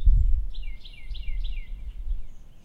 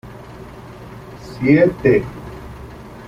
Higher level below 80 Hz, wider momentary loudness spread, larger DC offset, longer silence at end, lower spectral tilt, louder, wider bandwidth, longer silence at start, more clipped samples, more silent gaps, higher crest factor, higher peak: first, -26 dBFS vs -42 dBFS; second, 16 LU vs 23 LU; neither; about the same, 0.05 s vs 0 s; second, -6.5 dB/octave vs -8.5 dB/octave; second, -34 LUFS vs -15 LUFS; second, 4.4 kHz vs 14.5 kHz; about the same, 0 s vs 0.05 s; neither; neither; about the same, 16 dB vs 18 dB; second, -8 dBFS vs -2 dBFS